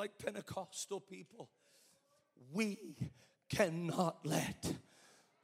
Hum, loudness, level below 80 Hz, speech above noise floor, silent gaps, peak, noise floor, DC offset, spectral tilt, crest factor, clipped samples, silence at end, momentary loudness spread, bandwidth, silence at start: none; -41 LUFS; -70 dBFS; 33 dB; none; -18 dBFS; -74 dBFS; under 0.1%; -5 dB/octave; 24 dB; under 0.1%; 0.65 s; 18 LU; 16 kHz; 0 s